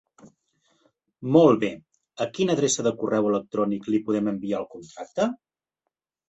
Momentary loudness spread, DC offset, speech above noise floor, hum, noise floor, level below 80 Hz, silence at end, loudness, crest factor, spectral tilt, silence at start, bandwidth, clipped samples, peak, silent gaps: 17 LU; under 0.1%; 60 dB; none; -83 dBFS; -66 dBFS; 0.95 s; -24 LUFS; 22 dB; -5 dB/octave; 0.25 s; 8.4 kHz; under 0.1%; -4 dBFS; none